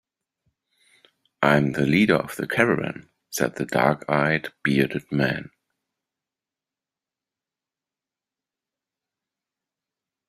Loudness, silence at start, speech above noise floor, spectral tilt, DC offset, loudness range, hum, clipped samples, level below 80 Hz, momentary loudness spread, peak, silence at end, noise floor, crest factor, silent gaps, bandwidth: -22 LUFS; 1.4 s; 68 dB; -5.5 dB/octave; under 0.1%; 8 LU; none; under 0.1%; -60 dBFS; 7 LU; -2 dBFS; 4.85 s; -90 dBFS; 24 dB; none; 15.5 kHz